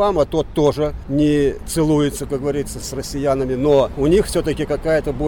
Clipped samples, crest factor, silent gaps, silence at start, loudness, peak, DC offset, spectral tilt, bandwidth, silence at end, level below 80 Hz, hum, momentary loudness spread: under 0.1%; 12 dB; none; 0 s; -19 LUFS; -6 dBFS; under 0.1%; -6 dB/octave; 19.5 kHz; 0 s; -32 dBFS; none; 7 LU